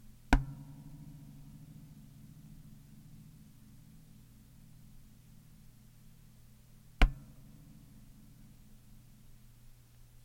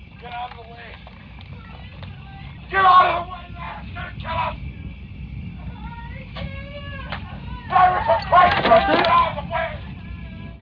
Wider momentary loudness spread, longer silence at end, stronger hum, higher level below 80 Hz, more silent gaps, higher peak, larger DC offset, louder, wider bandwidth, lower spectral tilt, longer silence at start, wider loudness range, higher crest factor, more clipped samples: first, 27 LU vs 23 LU; first, 0.9 s vs 0 s; neither; about the same, -42 dBFS vs -38 dBFS; neither; second, -10 dBFS vs -4 dBFS; neither; second, -38 LUFS vs -18 LUFS; first, 16.5 kHz vs 5.4 kHz; second, -5.5 dB/octave vs -7.5 dB/octave; about the same, 0.05 s vs 0 s; first, 17 LU vs 13 LU; first, 30 dB vs 18 dB; neither